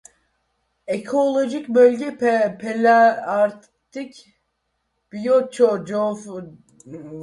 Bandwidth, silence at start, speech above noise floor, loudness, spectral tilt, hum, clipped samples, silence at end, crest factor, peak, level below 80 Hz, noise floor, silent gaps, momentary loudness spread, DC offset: 11.5 kHz; 0.9 s; 54 dB; -19 LUFS; -5.5 dB/octave; none; under 0.1%; 0 s; 18 dB; -4 dBFS; -68 dBFS; -73 dBFS; none; 22 LU; under 0.1%